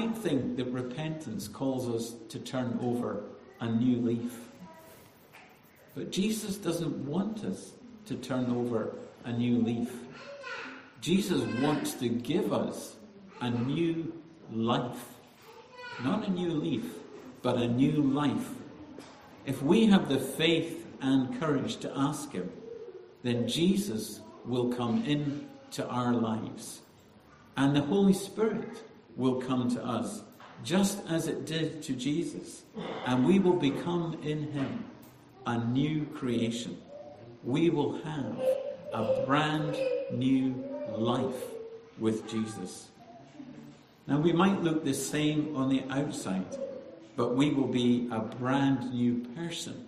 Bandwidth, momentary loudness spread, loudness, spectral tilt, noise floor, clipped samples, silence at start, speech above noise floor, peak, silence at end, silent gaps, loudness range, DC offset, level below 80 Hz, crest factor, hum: 14.5 kHz; 17 LU; -31 LUFS; -6 dB/octave; -57 dBFS; under 0.1%; 0 s; 27 dB; -10 dBFS; 0 s; none; 5 LU; under 0.1%; -66 dBFS; 20 dB; none